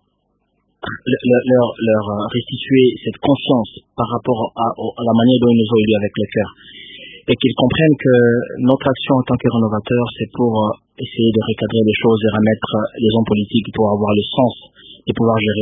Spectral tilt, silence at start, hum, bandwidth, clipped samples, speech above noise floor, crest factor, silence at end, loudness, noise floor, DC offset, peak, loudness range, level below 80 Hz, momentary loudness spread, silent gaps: -11.5 dB/octave; 0.85 s; none; 3.8 kHz; under 0.1%; 50 dB; 16 dB; 0 s; -16 LUFS; -66 dBFS; under 0.1%; 0 dBFS; 2 LU; -46 dBFS; 11 LU; none